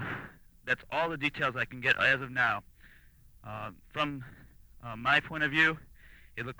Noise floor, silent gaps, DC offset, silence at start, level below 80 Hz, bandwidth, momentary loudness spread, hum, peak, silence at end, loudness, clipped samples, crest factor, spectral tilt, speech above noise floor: -57 dBFS; none; under 0.1%; 0 s; -58 dBFS; over 20 kHz; 19 LU; none; -12 dBFS; 0.05 s; -29 LUFS; under 0.1%; 22 dB; -5 dB/octave; 27 dB